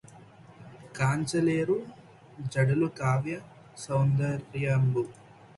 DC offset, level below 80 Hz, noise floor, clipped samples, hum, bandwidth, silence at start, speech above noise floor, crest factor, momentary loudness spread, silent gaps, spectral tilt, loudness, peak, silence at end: under 0.1%; -60 dBFS; -52 dBFS; under 0.1%; none; 11.5 kHz; 0.1 s; 25 dB; 16 dB; 17 LU; none; -7 dB/octave; -28 LUFS; -12 dBFS; 0.45 s